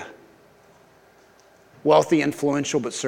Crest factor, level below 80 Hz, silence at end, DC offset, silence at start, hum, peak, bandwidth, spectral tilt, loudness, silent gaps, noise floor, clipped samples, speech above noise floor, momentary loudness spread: 20 dB; -68 dBFS; 0 s; under 0.1%; 0 s; none; -4 dBFS; 16.5 kHz; -4.5 dB/octave; -21 LUFS; none; -54 dBFS; under 0.1%; 34 dB; 10 LU